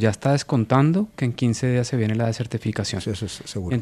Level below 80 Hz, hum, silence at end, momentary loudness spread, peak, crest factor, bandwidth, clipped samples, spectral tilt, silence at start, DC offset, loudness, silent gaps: -50 dBFS; none; 0 s; 10 LU; -4 dBFS; 18 dB; 12.5 kHz; under 0.1%; -6.5 dB/octave; 0 s; under 0.1%; -23 LUFS; none